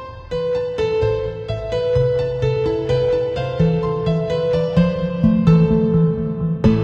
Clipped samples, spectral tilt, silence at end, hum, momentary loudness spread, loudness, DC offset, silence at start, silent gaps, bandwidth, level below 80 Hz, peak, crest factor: under 0.1%; -9 dB/octave; 0 s; none; 8 LU; -18 LUFS; under 0.1%; 0 s; none; 7 kHz; -34 dBFS; -2 dBFS; 16 dB